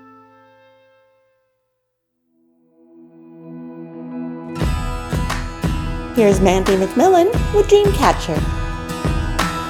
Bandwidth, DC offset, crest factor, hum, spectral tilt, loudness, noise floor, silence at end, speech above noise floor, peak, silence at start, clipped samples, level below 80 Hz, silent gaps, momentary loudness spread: 18.5 kHz; under 0.1%; 18 dB; 60 Hz at -45 dBFS; -6 dB/octave; -17 LUFS; -72 dBFS; 0 s; 58 dB; 0 dBFS; 3.25 s; under 0.1%; -28 dBFS; none; 18 LU